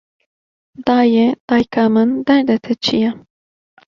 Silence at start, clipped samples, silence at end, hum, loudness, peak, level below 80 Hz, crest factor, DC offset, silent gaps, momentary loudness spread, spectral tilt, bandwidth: 0.8 s; under 0.1%; 0.7 s; none; -15 LUFS; -2 dBFS; -54 dBFS; 14 dB; under 0.1%; 1.40-1.48 s; 6 LU; -6 dB/octave; 7.2 kHz